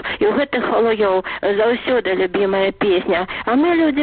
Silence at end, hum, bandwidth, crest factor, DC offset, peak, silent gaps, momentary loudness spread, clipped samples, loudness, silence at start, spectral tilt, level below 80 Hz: 0 s; none; 4.7 kHz; 10 dB; under 0.1%; -8 dBFS; none; 3 LU; under 0.1%; -17 LUFS; 0 s; -3 dB/octave; -48 dBFS